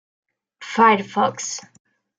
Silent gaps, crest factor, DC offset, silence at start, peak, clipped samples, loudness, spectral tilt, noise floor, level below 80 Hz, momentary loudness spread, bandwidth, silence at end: none; 18 dB; under 0.1%; 0.6 s; -4 dBFS; under 0.1%; -19 LUFS; -3.5 dB/octave; -40 dBFS; -76 dBFS; 16 LU; 9.6 kHz; 0.6 s